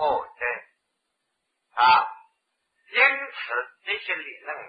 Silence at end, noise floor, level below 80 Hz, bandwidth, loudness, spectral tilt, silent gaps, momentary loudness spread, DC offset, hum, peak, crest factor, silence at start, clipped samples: 0 s; -78 dBFS; -68 dBFS; 5 kHz; -23 LUFS; -4.5 dB/octave; none; 15 LU; under 0.1%; none; -4 dBFS; 22 dB; 0 s; under 0.1%